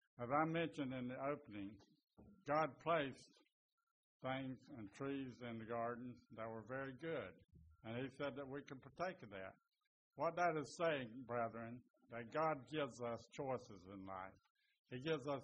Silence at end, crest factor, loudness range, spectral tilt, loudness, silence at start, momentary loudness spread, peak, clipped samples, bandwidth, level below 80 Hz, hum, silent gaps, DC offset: 0 s; 22 dB; 6 LU; -4.5 dB/octave; -46 LUFS; 0.2 s; 15 LU; -26 dBFS; under 0.1%; 8 kHz; -80 dBFS; none; 3.52-4.20 s, 9.87-10.11 s, 11.90-11.94 s, 14.50-14.55 s, 14.79-14.84 s; under 0.1%